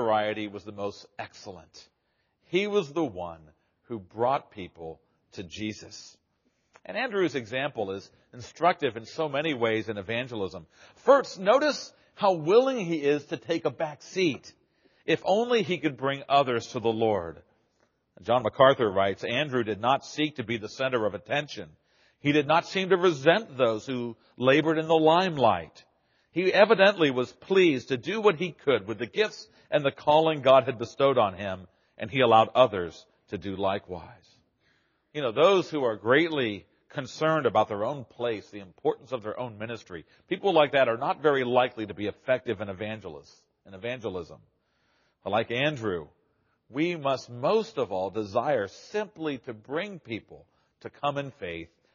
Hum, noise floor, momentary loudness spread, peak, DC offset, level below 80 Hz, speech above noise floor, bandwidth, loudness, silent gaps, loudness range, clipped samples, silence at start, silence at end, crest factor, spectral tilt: none; -75 dBFS; 18 LU; -6 dBFS; under 0.1%; -68 dBFS; 48 dB; 7.2 kHz; -26 LUFS; none; 9 LU; under 0.1%; 0 s; 0.3 s; 22 dB; -3.5 dB/octave